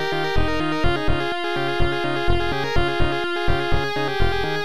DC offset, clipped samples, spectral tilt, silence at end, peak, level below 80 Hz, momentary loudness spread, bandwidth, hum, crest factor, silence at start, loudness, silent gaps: 5%; under 0.1%; -6 dB/octave; 0 s; -6 dBFS; -28 dBFS; 1 LU; 14 kHz; none; 14 dB; 0 s; -23 LUFS; none